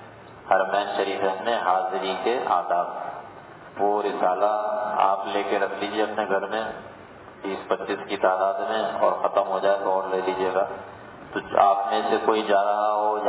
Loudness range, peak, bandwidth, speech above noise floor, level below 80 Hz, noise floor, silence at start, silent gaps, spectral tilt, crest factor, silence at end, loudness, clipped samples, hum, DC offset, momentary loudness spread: 3 LU; -4 dBFS; 4 kHz; 21 dB; -64 dBFS; -44 dBFS; 0 s; none; -8 dB/octave; 20 dB; 0 s; -24 LUFS; under 0.1%; none; under 0.1%; 15 LU